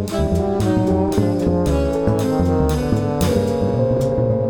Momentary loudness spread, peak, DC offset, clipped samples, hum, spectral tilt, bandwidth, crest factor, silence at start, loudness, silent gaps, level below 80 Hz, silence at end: 2 LU; -4 dBFS; 0.4%; under 0.1%; none; -7.5 dB/octave; over 20 kHz; 14 dB; 0 s; -18 LUFS; none; -30 dBFS; 0 s